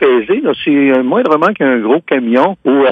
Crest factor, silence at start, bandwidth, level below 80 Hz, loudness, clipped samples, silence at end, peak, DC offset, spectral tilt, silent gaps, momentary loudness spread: 10 dB; 0 s; 5.6 kHz; -56 dBFS; -12 LUFS; under 0.1%; 0 s; 0 dBFS; under 0.1%; -7.5 dB/octave; none; 3 LU